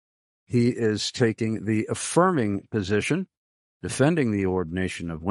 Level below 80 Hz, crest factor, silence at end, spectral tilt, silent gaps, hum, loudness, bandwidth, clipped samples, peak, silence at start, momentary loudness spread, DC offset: -56 dBFS; 20 dB; 0 s; -5.5 dB/octave; 3.37-3.80 s; none; -25 LUFS; 11.5 kHz; under 0.1%; -6 dBFS; 0.5 s; 8 LU; under 0.1%